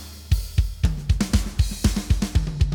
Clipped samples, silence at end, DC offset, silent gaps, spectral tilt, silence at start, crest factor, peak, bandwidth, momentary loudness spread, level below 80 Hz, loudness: under 0.1%; 0 s; under 0.1%; none; -5.5 dB/octave; 0 s; 16 dB; -6 dBFS; 20 kHz; 4 LU; -24 dBFS; -24 LUFS